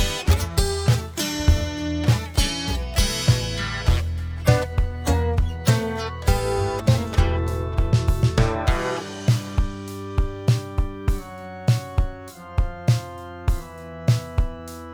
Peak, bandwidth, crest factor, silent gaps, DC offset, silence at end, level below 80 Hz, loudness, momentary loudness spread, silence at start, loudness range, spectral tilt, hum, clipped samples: -4 dBFS; over 20 kHz; 18 dB; none; under 0.1%; 0 s; -26 dBFS; -23 LUFS; 8 LU; 0 s; 4 LU; -5.5 dB/octave; none; under 0.1%